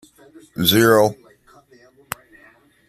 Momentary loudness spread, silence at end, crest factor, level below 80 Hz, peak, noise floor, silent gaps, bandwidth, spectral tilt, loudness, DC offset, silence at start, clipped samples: 20 LU; 1.75 s; 22 dB; -56 dBFS; 0 dBFS; -52 dBFS; none; 15.5 kHz; -4 dB/octave; -16 LUFS; under 0.1%; 0.6 s; under 0.1%